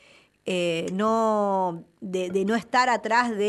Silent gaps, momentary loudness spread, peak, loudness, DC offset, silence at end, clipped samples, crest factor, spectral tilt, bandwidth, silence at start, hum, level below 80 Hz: none; 9 LU; -10 dBFS; -24 LUFS; under 0.1%; 0 s; under 0.1%; 16 dB; -5 dB/octave; 12 kHz; 0.45 s; none; -68 dBFS